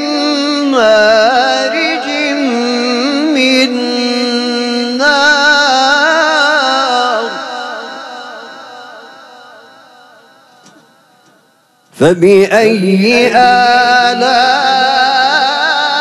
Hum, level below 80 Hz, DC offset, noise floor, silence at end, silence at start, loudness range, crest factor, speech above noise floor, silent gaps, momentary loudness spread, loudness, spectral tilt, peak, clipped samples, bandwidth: none; -54 dBFS; under 0.1%; -51 dBFS; 0 s; 0 s; 11 LU; 10 dB; 43 dB; none; 14 LU; -10 LUFS; -3.5 dB/octave; 0 dBFS; under 0.1%; 14 kHz